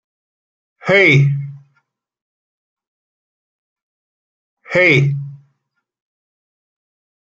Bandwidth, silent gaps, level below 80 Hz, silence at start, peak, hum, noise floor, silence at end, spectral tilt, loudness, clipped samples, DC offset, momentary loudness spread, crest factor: 7.6 kHz; 2.22-2.77 s, 2.87-3.76 s, 3.82-4.57 s; -58 dBFS; 0.85 s; 0 dBFS; none; -72 dBFS; 1.85 s; -6.5 dB/octave; -13 LUFS; under 0.1%; under 0.1%; 18 LU; 20 dB